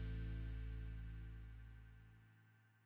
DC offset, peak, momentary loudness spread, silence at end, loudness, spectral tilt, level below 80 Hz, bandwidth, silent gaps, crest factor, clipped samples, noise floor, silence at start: under 0.1%; -38 dBFS; 18 LU; 0.05 s; -52 LUFS; -8.5 dB/octave; -52 dBFS; 4.4 kHz; none; 12 dB; under 0.1%; -71 dBFS; 0 s